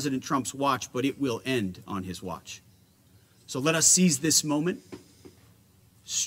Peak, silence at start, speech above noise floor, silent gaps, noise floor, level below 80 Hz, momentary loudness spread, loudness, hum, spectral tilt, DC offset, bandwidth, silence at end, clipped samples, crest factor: -6 dBFS; 0 s; 33 dB; none; -60 dBFS; -66 dBFS; 20 LU; -25 LUFS; none; -3 dB/octave; under 0.1%; 16 kHz; 0 s; under 0.1%; 24 dB